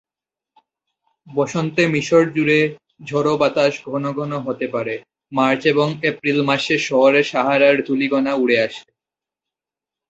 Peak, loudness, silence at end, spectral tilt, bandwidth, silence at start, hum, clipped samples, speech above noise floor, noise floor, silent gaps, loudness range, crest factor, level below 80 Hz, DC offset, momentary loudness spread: -2 dBFS; -18 LUFS; 1.3 s; -5.5 dB/octave; 8.2 kHz; 1.25 s; none; under 0.1%; 71 dB; -89 dBFS; none; 3 LU; 18 dB; -62 dBFS; under 0.1%; 10 LU